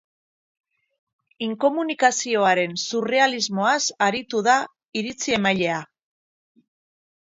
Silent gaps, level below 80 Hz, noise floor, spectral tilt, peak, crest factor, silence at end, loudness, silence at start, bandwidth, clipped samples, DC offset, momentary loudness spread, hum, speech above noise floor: 4.85-4.92 s; -66 dBFS; under -90 dBFS; -3 dB/octave; -4 dBFS; 20 dB; 1.35 s; -22 LUFS; 1.4 s; 7.8 kHz; under 0.1%; under 0.1%; 10 LU; none; over 69 dB